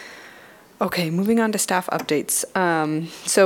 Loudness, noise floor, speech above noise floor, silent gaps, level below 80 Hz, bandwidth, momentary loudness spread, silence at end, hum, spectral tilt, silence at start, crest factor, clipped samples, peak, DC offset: -22 LUFS; -47 dBFS; 26 dB; none; -64 dBFS; 18 kHz; 7 LU; 0 s; none; -4 dB/octave; 0 s; 18 dB; under 0.1%; -4 dBFS; under 0.1%